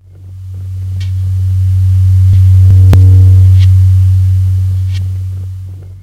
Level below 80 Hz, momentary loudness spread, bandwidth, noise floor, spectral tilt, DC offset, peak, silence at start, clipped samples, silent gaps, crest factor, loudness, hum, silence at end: -26 dBFS; 18 LU; 4.5 kHz; -28 dBFS; -8 dB/octave; under 0.1%; 0 dBFS; 0.2 s; 0.9%; none; 8 dB; -8 LUFS; none; 0.05 s